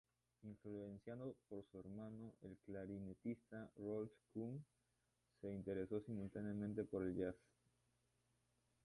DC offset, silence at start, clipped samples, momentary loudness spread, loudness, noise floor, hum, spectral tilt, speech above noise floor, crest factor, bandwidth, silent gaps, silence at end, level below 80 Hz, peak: under 0.1%; 0.4 s; under 0.1%; 11 LU; -51 LUFS; -86 dBFS; 60 Hz at -75 dBFS; -9.5 dB/octave; 37 dB; 20 dB; 11 kHz; none; 1.5 s; -74 dBFS; -32 dBFS